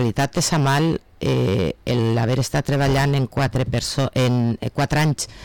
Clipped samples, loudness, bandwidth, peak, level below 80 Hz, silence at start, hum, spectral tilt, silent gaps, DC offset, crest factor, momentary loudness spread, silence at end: under 0.1%; -20 LUFS; 18.5 kHz; -12 dBFS; -40 dBFS; 0 s; none; -5.5 dB/octave; none; 0.3%; 8 dB; 4 LU; 0 s